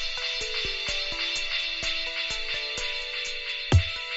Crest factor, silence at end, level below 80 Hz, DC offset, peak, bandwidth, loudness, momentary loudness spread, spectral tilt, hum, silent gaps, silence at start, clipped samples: 22 dB; 0 s; -40 dBFS; under 0.1%; -8 dBFS; 8 kHz; -27 LUFS; 6 LU; -2 dB/octave; none; none; 0 s; under 0.1%